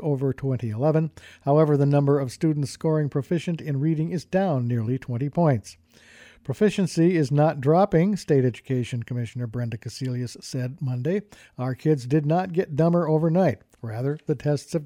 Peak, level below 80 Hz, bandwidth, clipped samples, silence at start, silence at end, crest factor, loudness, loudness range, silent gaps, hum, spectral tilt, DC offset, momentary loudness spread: -8 dBFS; -58 dBFS; 12.5 kHz; under 0.1%; 0 s; 0 s; 16 dB; -24 LUFS; 5 LU; none; none; -8 dB/octave; under 0.1%; 11 LU